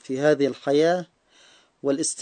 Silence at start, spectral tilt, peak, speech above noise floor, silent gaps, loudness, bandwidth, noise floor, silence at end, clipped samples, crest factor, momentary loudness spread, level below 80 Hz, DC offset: 0.1 s; -4 dB/octave; -8 dBFS; 34 dB; none; -23 LUFS; 9.4 kHz; -56 dBFS; 0 s; under 0.1%; 16 dB; 9 LU; -74 dBFS; under 0.1%